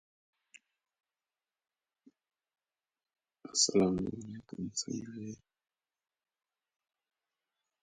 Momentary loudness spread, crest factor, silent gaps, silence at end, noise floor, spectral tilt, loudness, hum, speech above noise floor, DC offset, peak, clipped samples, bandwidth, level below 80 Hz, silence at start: 19 LU; 28 dB; none; 2.45 s; under -90 dBFS; -3.5 dB/octave; -33 LUFS; none; over 56 dB; under 0.1%; -12 dBFS; under 0.1%; 9.4 kHz; -68 dBFS; 3.45 s